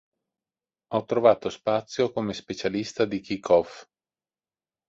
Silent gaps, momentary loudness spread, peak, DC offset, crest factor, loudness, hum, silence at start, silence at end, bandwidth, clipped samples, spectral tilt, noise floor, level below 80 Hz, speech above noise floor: none; 10 LU; -6 dBFS; under 0.1%; 22 dB; -25 LUFS; none; 0.9 s; 1.05 s; 7.8 kHz; under 0.1%; -5.5 dB/octave; under -90 dBFS; -62 dBFS; over 65 dB